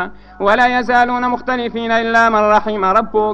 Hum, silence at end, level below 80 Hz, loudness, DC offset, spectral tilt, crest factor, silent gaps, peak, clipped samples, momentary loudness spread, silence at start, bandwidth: 50 Hz at -40 dBFS; 0 s; -42 dBFS; -14 LUFS; under 0.1%; -5 dB/octave; 14 dB; none; 0 dBFS; under 0.1%; 7 LU; 0 s; 8.8 kHz